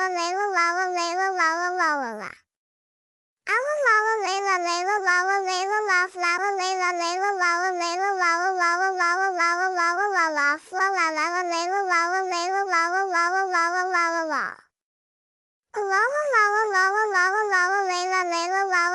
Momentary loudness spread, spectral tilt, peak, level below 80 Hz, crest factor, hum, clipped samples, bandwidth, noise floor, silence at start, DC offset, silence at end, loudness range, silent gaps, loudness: 4 LU; 0 dB/octave; -8 dBFS; -80 dBFS; 16 dB; none; under 0.1%; 12 kHz; under -90 dBFS; 0 s; under 0.1%; 0 s; 3 LU; 2.56-3.37 s, 14.82-15.63 s; -22 LUFS